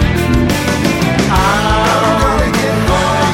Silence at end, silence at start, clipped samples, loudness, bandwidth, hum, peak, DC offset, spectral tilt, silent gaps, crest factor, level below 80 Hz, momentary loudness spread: 0 s; 0 s; under 0.1%; -12 LUFS; 17 kHz; none; 0 dBFS; under 0.1%; -5 dB/octave; none; 12 dB; -22 dBFS; 2 LU